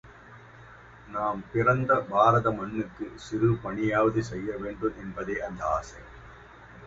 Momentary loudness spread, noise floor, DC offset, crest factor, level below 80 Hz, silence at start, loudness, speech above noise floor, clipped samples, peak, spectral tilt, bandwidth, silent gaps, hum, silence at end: 16 LU; -50 dBFS; under 0.1%; 22 dB; -52 dBFS; 0.05 s; -27 LUFS; 22 dB; under 0.1%; -6 dBFS; -7.5 dB/octave; 8 kHz; none; none; 0 s